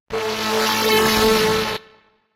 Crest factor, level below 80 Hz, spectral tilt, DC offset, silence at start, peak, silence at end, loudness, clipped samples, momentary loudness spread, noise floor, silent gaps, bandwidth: 16 dB; -42 dBFS; -3 dB/octave; under 0.1%; 0.1 s; -4 dBFS; 0.55 s; -18 LUFS; under 0.1%; 9 LU; -54 dBFS; none; 16 kHz